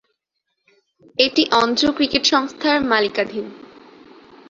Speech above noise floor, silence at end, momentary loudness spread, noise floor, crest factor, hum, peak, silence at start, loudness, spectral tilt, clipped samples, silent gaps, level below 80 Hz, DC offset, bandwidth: 58 dB; 0.9 s; 12 LU; -76 dBFS; 20 dB; none; -2 dBFS; 1.2 s; -17 LUFS; -2.5 dB/octave; under 0.1%; none; -56 dBFS; under 0.1%; 7.8 kHz